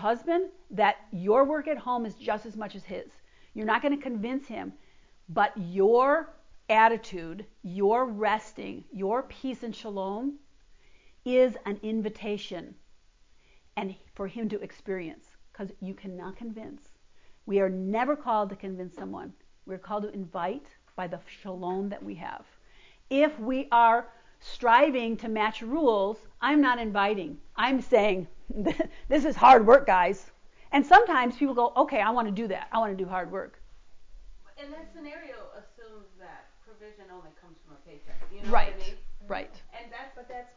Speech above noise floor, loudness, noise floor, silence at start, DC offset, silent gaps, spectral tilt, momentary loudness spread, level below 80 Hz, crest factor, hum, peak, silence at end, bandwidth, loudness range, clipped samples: 32 dB; -26 LUFS; -59 dBFS; 0 s; under 0.1%; none; -6 dB/octave; 21 LU; -50 dBFS; 22 dB; none; -6 dBFS; 0.15 s; 7.6 kHz; 16 LU; under 0.1%